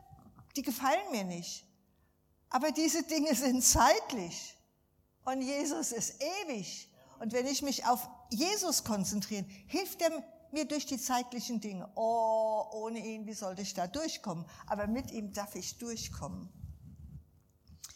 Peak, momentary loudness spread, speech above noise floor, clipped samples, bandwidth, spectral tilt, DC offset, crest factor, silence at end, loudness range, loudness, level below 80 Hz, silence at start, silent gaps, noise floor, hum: -12 dBFS; 14 LU; 38 dB; under 0.1%; 18.5 kHz; -3 dB/octave; under 0.1%; 22 dB; 0 s; 8 LU; -34 LUFS; -56 dBFS; 0.1 s; none; -72 dBFS; none